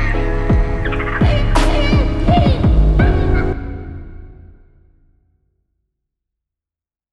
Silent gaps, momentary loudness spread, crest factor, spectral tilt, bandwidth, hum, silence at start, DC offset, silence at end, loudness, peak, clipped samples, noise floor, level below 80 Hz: none; 15 LU; 14 dB; -7 dB/octave; 11 kHz; none; 0 s; under 0.1%; 2.65 s; -16 LUFS; -2 dBFS; under 0.1%; -90 dBFS; -18 dBFS